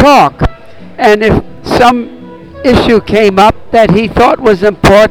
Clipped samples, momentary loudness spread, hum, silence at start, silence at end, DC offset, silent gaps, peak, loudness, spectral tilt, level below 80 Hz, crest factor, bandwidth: under 0.1%; 9 LU; none; 0 s; 0 s; 2%; none; 0 dBFS; -8 LUFS; -6 dB/octave; -24 dBFS; 8 dB; 19.5 kHz